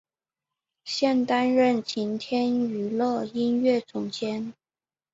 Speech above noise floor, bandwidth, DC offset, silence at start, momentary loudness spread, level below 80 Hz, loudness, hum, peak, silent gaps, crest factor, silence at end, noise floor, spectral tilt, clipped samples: over 65 dB; 7.8 kHz; under 0.1%; 0.85 s; 10 LU; -70 dBFS; -25 LUFS; none; -10 dBFS; none; 16 dB; 0.6 s; under -90 dBFS; -5 dB/octave; under 0.1%